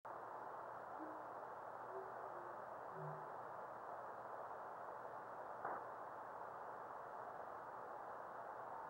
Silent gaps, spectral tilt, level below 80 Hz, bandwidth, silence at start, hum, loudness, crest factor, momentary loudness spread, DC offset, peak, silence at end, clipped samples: none; -6.5 dB/octave; -88 dBFS; 16 kHz; 0.05 s; none; -52 LUFS; 18 dB; 2 LU; under 0.1%; -34 dBFS; 0 s; under 0.1%